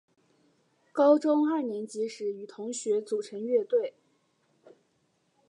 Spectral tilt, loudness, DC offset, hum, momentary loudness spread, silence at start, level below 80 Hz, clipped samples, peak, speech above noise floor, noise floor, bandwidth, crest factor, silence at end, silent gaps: -4.5 dB/octave; -28 LUFS; under 0.1%; none; 14 LU; 0.95 s; -90 dBFS; under 0.1%; -12 dBFS; 45 dB; -72 dBFS; 11 kHz; 18 dB; 1.6 s; none